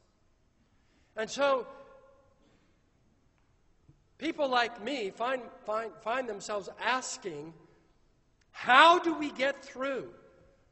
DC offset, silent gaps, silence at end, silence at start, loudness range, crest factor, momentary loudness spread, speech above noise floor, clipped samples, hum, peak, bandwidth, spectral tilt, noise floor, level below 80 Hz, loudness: under 0.1%; none; 0.6 s; 1.15 s; 10 LU; 28 dB; 18 LU; 39 dB; under 0.1%; none; -6 dBFS; 8.2 kHz; -2.5 dB/octave; -68 dBFS; -70 dBFS; -29 LUFS